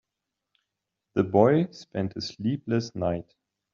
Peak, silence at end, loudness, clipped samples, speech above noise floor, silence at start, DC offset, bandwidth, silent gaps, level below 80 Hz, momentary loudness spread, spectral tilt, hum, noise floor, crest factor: -6 dBFS; 0.5 s; -27 LUFS; under 0.1%; 60 dB; 1.15 s; under 0.1%; 7.4 kHz; none; -62 dBFS; 12 LU; -6.5 dB/octave; none; -85 dBFS; 22 dB